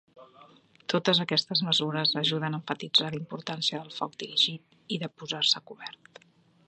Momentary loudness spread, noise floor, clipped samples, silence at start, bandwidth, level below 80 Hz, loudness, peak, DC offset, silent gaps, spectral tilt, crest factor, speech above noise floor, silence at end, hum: 12 LU; -57 dBFS; under 0.1%; 0.15 s; 9.4 kHz; -78 dBFS; -27 LUFS; -10 dBFS; under 0.1%; none; -4 dB/octave; 22 dB; 27 dB; 0.75 s; none